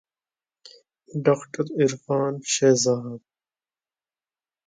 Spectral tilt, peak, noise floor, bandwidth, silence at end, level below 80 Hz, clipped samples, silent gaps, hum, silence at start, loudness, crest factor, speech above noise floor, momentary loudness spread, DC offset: -4.5 dB/octave; -6 dBFS; under -90 dBFS; 9.6 kHz; 1.5 s; -70 dBFS; under 0.1%; none; none; 1.15 s; -23 LUFS; 20 dB; over 68 dB; 14 LU; under 0.1%